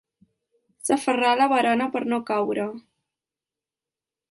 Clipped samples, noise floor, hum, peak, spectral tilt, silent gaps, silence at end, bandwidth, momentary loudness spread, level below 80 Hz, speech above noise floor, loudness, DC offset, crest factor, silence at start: under 0.1%; under -90 dBFS; none; -8 dBFS; -3.5 dB/octave; none; 1.5 s; 11.5 kHz; 12 LU; -72 dBFS; over 68 dB; -23 LUFS; under 0.1%; 18 dB; 0.85 s